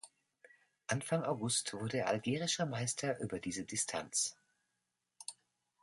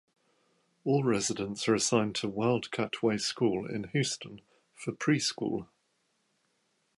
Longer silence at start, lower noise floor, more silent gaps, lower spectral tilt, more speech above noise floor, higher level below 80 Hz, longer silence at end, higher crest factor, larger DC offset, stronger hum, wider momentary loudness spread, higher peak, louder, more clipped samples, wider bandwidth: second, 0.05 s vs 0.85 s; first, -86 dBFS vs -75 dBFS; neither; about the same, -3.5 dB/octave vs -4.5 dB/octave; first, 49 dB vs 45 dB; about the same, -72 dBFS vs -68 dBFS; second, 0.5 s vs 1.35 s; about the same, 20 dB vs 20 dB; neither; neither; first, 14 LU vs 11 LU; second, -18 dBFS vs -12 dBFS; second, -37 LUFS vs -30 LUFS; neither; about the same, 12 kHz vs 11.5 kHz